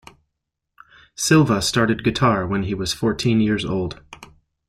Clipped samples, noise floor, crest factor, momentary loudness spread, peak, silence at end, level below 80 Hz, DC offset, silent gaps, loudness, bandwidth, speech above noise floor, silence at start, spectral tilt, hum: under 0.1%; -79 dBFS; 20 dB; 9 LU; -2 dBFS; 0.45 s; -46 dBFS; under 0.1%; none; -20 LUFS; 15.5 kHz; 60 dB; 1.2 s; -5 dB/octave; none